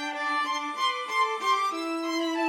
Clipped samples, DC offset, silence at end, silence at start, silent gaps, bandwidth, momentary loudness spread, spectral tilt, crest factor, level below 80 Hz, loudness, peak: under 0.1%; under 0.1%; 0 s; 0 s; none; 16 kHz; 4 LU; 0 dB/octave; 14 dB; under -90 dBFS; -27 LUFS; -14 dBFS